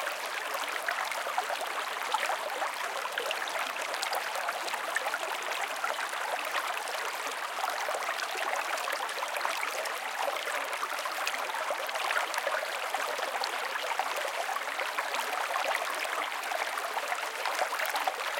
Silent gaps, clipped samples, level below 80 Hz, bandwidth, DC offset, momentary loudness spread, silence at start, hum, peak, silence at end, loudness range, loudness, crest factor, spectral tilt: none; under 0.1%; -88 dBFS; 17 kHz; under 0.1%; 3 LU; 0 s; none; -12 dBFS; 0 s; 1 LU; -32 LUFS; 22 dB; 1.5 dB/octave